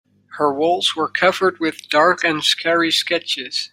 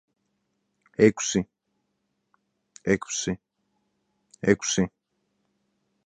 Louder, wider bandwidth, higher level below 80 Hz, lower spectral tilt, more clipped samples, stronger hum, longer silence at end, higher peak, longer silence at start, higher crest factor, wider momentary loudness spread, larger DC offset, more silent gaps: first, -17 LUFS vs -25 LUFS; first, 16 kHz vs 10 kHz; second, -66 dBFS vs -58 dBFS; second, -2.5 dB/octave vs -4.5 dB/octave; neither; neither; second, 0.05 s vs 1.2 s; about the same, -2 dBFS vs -4 dBFS; second, 0.3 s vs 1 s; second, 16 dB vs 24 dB; second, 6 LU vs 14 LU; neither; neither